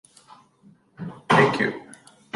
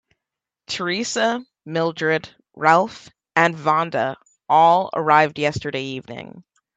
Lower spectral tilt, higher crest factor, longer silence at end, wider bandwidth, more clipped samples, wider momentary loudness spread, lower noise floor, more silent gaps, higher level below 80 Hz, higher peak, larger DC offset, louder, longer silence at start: about the same, -5.5 dB/octave vs -4.5 dB/octave; about the same, 22 dB vs 20 dB; about the same, 0.4 s vs 0.35 s; first, 11.5 kHz vs 9 kHz; neither; first, 21 LU vs 14 LU; second, -56 dBFS vs -85 dBFS; neither; about the same, -62 dBFS vs -62 dBFS; second, -4 dBFS vs 0 dBFS; neither; about the same, -20 LUFS vs -20 LUFS; first, 1 s vs 0.7 s